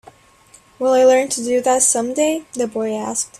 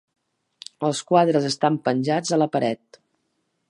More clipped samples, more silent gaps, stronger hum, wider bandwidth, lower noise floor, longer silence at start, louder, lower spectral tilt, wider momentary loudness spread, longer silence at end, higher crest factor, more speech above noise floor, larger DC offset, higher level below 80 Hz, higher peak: neither; neither; neither; first, 14 kHz vs 11.5 kHz; second, -49 dBFS vs -73 dBFS; about the same, 0.8 s vs 0.8 s; first, -17 LUFS vs -22 LUFS; second, -2 dB/octave vs -5.5 dB/octave; second, 10 LU vs 13 LU; second, 0.15 s vs 0.95 s; about the same, 16 dB vs 20 dB; second, 33 dB vs 52 dB; neither; first, -62 dBFS vs -72 dBFS; about the same, -2 dBFS vs -4 dBFS